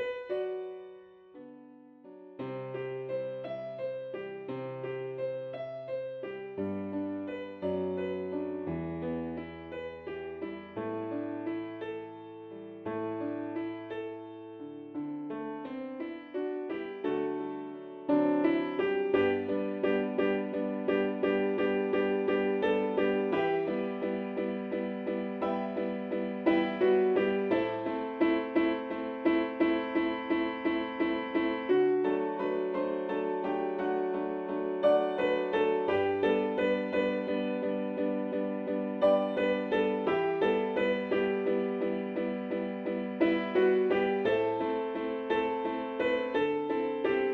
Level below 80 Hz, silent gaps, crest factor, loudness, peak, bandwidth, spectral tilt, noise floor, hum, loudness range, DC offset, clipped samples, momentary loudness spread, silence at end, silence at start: -66 dBFS; none; 16 dB; -31 LUFS; -14 dBFS; 5.2 kHz; -8 dB/octave; -53 dBFS; none; 9 LU; under 0.1%; under 0.1%; 12 LU; 0 s; 0 s